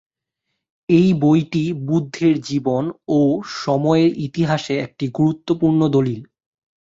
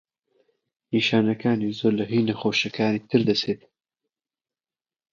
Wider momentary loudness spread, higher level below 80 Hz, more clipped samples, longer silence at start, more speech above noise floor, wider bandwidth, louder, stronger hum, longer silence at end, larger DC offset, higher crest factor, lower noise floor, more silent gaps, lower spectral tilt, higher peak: first, 8 LU vs 4 LU; first, -56 dBFS vs -66 dBFS; neither; about the same, 0.9 s vs 0.9 s; second, 60 dB vs over 67 dB; about the same, 7.8 kHz vs 7.4 kHz; first, -18 LUFS vs -23 LUFS; neither; second, 0.6 s vs 1.55 s; neither; about the same, 16 dB vs 20 dB; second, -78 dBFS vs under -90 dBFS; neither; first, -7.5 dB/octave vs -6 dB/octave; first, -2 dBFS vs -6 dBFS